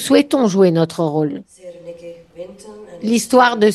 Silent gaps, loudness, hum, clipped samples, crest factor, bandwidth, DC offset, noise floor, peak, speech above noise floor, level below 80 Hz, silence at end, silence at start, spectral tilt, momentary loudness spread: none; -15 LUFS; none; under 0.1%; 16 dB; 12.5 kHz; under 0.1%; -36 dBFS; 0 dBFS; 20 dB; -60 dBFS; 0 s; 0 s; -5 dB/octave; 23 LU